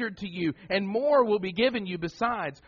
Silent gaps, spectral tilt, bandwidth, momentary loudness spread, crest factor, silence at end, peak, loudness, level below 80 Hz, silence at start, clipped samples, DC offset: none; -3.5 dB/octave; 7.2 kHz; 9 LU; 16 dB; 0.15 s; -10 dBFS; -27 LUFS; -60 dBFS; 0 s; under 0.1%; under 0.1%